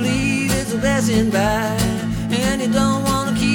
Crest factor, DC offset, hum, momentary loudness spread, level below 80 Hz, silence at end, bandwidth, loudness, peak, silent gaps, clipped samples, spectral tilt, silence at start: 14 dB; under 0.1%; none; 3 LU; -34 dBFS; 0 s; 19.5 kHz; -18 LUFS; -4 dBFS; none; under 0.1%; -5 dB/octave; 0 s